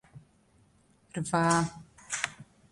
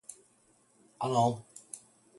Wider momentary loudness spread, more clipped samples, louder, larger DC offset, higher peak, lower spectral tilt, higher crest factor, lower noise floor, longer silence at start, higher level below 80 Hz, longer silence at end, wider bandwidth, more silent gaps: second, 15 LU vs 19 LU; neither; about the same, -30 LUFS vs -31 LUFS; neither; first, -10 dBFS vs -14 dBFS; second, -4.5 dB/octave vs -6 dB/octave; about the same, 24 dB vs 20 dB; about the same, -65 dBFS vs -67 dBFS; about the same, 0.15 s vs 0.1 s; first, -62 dBFS vs -72 dBFS; about the same, 0.3 s vs 0.4 s; about the same, 11.5 kHz vs 12 kHz; neither